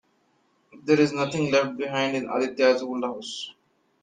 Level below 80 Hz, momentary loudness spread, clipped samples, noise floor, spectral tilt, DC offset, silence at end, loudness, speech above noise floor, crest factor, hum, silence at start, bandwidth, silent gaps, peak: -68 dBFS; 13 LU; under 0.1%; -67 dBFS; -5 dB/octave; under 0.1%; 0.5 s; -24 LUFS; 43 dB; 18 dB; none; 0.75 s; 9.6 kHz; none; -6 dBFS